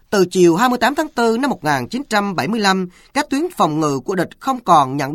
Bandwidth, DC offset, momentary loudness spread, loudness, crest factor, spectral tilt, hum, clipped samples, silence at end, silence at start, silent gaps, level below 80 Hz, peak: 16.5 kHz; under 0.1%; 8 LU; -17 LUFS; 16 dB; -5 dB/octave; none; under 0.1%; 0 s; 0.1 s; none; -52 dBFS; 0 dBFS